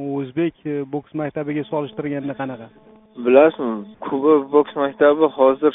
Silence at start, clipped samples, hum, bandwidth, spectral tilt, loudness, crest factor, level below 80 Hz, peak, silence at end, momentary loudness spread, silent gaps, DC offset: 0 s; under 0.1%; none; 3.9 kHz; -5.5 dB/octave; -19 LUFS; 18 dB; -62 dBFS; 0 dBFS; 0 s; 13 LU; none; under 0.1%